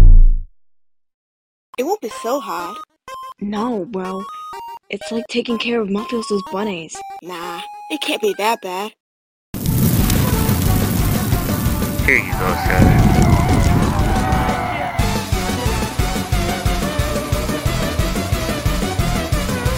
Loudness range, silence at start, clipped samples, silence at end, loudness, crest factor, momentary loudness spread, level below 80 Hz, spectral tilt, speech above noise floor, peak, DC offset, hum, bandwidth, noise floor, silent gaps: 9 LU; 0 s; under 0.1%; 0 s; -19 LUFS; 16 dB; 14 LU; -20 dBFS; -5.5 dB/octave; 40 dB; 0 dBFS; under 0.1%; none; 16.5 kHz; -59 dBFS; 1.14-1.73 s, 9.00-9.53 s